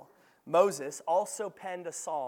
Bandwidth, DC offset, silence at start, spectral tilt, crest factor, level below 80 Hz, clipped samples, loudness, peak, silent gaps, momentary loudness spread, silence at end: 17.5 kHz; under 0.1%; 0 s; -3.5 dB/octave; 22 dB; under -90 dBFS; under 0.1%; -31 LUFS; -10 dBFS; none; 11 LU; 0 s